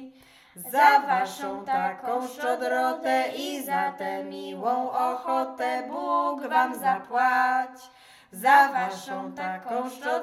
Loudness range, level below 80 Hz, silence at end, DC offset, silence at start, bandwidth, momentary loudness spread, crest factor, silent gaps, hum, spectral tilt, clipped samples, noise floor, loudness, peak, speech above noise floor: 4 LU; -78 dBFS; 0 s; under 0.1%; 0 s; 16 kHz; 14 LU; 20 dB; none; none; -3.5 dB/octave; under 0.1%; -53 dBFS; -25 LUFS; -4 dBFS; 27 dB